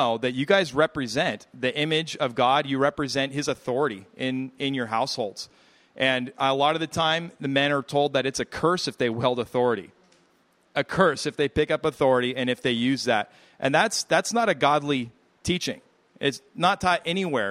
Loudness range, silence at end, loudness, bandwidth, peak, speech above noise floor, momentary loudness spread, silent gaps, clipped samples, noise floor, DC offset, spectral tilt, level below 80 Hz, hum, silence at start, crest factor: 3 LU; 0 s; -25 LUFS; 15 kHz; -4 dBFS; 39 dB; 7 LU; none; under 0.1%; -64 dBFS; under 0.1%; -4 dB/octave; -56 dBFS; none; 0 s; 20 dB